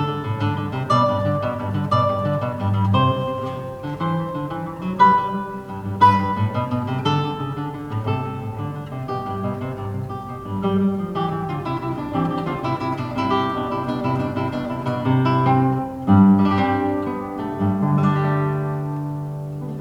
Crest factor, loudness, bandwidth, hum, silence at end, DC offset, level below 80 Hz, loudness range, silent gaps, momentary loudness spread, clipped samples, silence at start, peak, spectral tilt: 18 dB; -21 LUFS; 11.5 kHz; none; 0 s; under 0.1%; -48 dBFS; 7 LU; none; 12 LU; under 0.1%; 0 s; -2 dBFS; -8.5 dB/octave